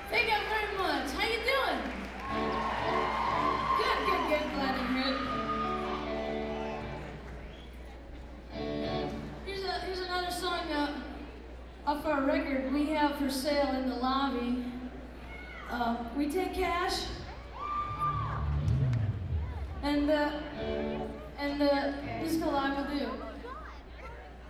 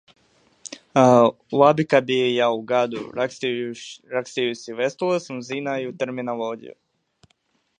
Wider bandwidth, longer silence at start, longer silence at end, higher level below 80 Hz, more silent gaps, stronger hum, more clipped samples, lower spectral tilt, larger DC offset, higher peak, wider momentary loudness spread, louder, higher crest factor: first, 15.5 kHz vs 9.8 kHz; second, 0 s vs 0.7 s; second, 0 s vs 1.1 s; first, -46 dBFS vs -68 dBFS; neither; neither; neither; about the same, -5.5 dB/octave vs -5.5 dB/octave; neither; second, -16 dBFS vs -2 dBFS; about the same, 16 LU vs 14 LU; second, -32 LUFS vs -22 LUFS; about the same, 18 dB vs 22 dB